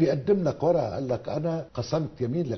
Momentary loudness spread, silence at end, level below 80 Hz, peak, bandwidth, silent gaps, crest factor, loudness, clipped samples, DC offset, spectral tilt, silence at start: 6 LU; 0 s; -54 dBFS; -10 dBFS; 6.4 kHz; none; 16 dB; -27 LUFS; under 0.1%; under 0.1%; -8 dB/octave; 0 s